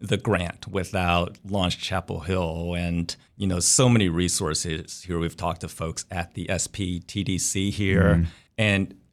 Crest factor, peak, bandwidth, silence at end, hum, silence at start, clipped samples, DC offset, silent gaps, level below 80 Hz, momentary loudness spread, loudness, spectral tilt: 18 dB; -6 dBFS; 15 kHz; 0.2 s; none; 0 s; under 0.1%; under 0.1%; none; -42 dBFS; 11 LU; -25 LUFS; -4 dB/octave